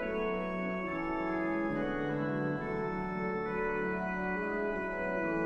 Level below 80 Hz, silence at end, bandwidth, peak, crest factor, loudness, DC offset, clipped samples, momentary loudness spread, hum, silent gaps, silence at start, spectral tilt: -52 dBFS; 0 s; 7.8 kHz; -22 dBFS; 12 dB; -34 LUFS; under 0.1%; under 0.1%; 2 LU; none; none; 0 s; -8.5 dB/octave